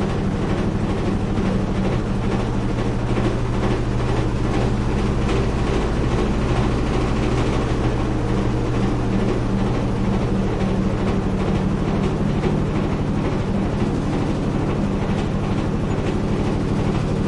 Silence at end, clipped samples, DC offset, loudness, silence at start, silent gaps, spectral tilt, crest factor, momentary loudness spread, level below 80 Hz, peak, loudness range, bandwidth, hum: 0 s; under 0.1%; under 0.1%; -21 LUFS; 0 s; none; -7.5 dB/octave; 14 dB; 1 LU; -26 dBFS; -6 dBFS; 1 LU; 11 kHz; none